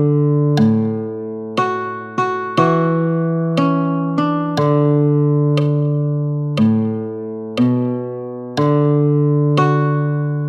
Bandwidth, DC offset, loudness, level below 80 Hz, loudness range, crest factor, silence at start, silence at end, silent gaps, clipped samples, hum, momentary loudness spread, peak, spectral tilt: 7 kHz; under 0.1%; -17 LUFS; -62 dBFS; 2 LU; 14 dB; 0 s; 0 s; none; under 0.1%; none; 9 LU; -2 dBFS; -9 dB/octave